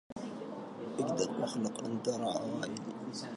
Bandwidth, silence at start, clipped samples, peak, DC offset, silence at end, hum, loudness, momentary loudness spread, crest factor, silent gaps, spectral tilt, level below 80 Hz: 11.5 kHz; 0.1 s; under 0.1%; -20 dBFS; under 0.1%; 0 s; none; -37 LUFS; 9 LU; 18 dB; 0.12-0.16 s; -5 dB/octave; -76 dBFS